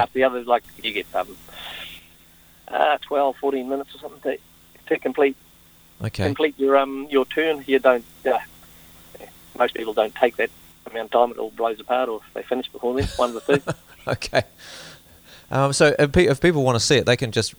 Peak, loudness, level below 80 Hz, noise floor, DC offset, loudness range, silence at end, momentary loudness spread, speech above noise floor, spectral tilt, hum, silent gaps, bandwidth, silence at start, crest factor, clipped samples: -2 dBFS; -22 LUFS; -46 dBFS; -52 dBFS; under 0.1%; 5 LU; 0.05 s; 17 LU; 30 dB; -5 dB/octave; none; none; over 20 kHz; 0 s; 20 dB; under 0.1%